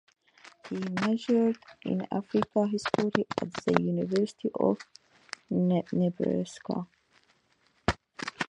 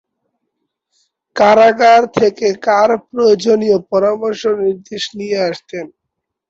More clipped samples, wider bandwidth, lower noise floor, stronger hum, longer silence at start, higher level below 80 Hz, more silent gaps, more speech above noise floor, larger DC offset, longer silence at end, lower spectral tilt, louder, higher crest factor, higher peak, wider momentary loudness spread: neither; first, 10 kHz vs 8 kHz; second, -69 dBFS vs -76 dBFS; neither; second, 0.45 s vs 1.35 s; about the same, -56 dBFS vs -58 dBFS; neither; second, 40 dB vs 64 dB; neither; second, 0.05 s vs 0.65 s; first, -6.5 dB/octave vs -4.5 dB/octave; second, -30 LUFS vs -13 LUFS; first, 26 dB vs 14 dB; second, -4 dBFS vs 0 dBFS; second, 11 LU vs 15 LU